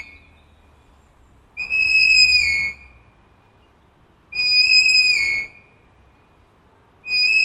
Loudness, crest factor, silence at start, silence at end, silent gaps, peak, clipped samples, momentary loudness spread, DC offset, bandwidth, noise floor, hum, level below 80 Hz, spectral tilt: -14 LUFS; 18 dB; 1.55 s; 0 s; none; -2 dBFS; under 0.1%; 19 LU; under 0.1%; 13.5 kHz; -55 dBFS; none; -50 dBFS; 1.5 dB/octave